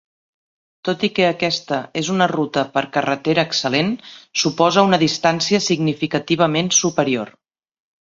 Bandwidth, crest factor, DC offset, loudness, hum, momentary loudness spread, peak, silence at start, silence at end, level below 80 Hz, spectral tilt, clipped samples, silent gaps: 7.8 kHz; 18 dB; under 0.1%; -18 LUFS; none; 8 LU; -2 dBFS; 0.85 s; 0.7 s; -60 dBFS; -3.5 dB/octave; under 0.1%; none